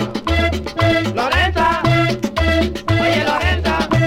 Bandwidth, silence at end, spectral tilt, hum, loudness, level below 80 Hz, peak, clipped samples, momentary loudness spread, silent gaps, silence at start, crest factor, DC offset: 16 kHz; 0 s; -6 dB/octave; none; -16 LUFS; -26 dBFS; -2 dBFS; under 0.1%; 3 LU; none; 0 s; 14 dB; under 0.1%